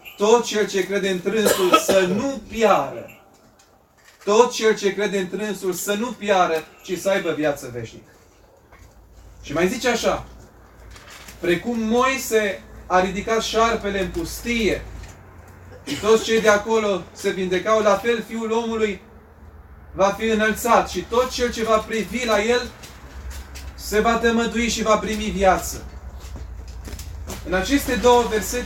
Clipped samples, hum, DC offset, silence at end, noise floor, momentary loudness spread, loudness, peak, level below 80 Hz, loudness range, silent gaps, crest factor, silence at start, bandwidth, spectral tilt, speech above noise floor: under 0.1%; none; under 0.1%; 0 s; -54 dBFS; 19 LU; -20 LUFS; -2 dBFS; -40 dBFS; 5 LU; none; 20 dB; 0.05 s; 17 kHz; -4 dB/octave; 34 dB